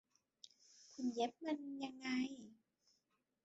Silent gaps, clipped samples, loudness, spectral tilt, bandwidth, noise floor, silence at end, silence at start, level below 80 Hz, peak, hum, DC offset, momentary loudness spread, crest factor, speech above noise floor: none; under 0.1%; -44 LUFS; -2.5 dB/octave; 8 kHz; -85 dBFS; 0.9 s; 0.45 s; -88 dBFS; -26 dBFS; none; under 0.1%; 21 LU; 20 dB; 42 dB